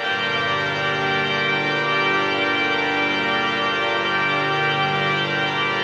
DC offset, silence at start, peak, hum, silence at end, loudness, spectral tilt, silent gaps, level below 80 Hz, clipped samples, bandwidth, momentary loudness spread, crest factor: under 0.1%; 0 s; -8 dBFS; 50 Hz at -75 dBFS; 0 s; -19 LUFS; -4.5 dB/octave; none; -64 dBFS; under 0.1%; 9.8 kHz; 2 LU; 14 dB